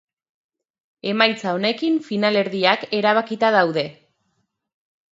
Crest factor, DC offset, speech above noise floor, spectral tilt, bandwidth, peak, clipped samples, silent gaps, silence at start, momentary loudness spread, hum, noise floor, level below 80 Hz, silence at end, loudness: 22 dB; under 0.1%; 52 dB; -5.5 dB/octave; 7.8 kHz; 0 dBFS; under 0.1%; none; 1.05 s; 8 LU; none; -71 dBFS; -74 dBFS; 1.2 s; -19 LUFS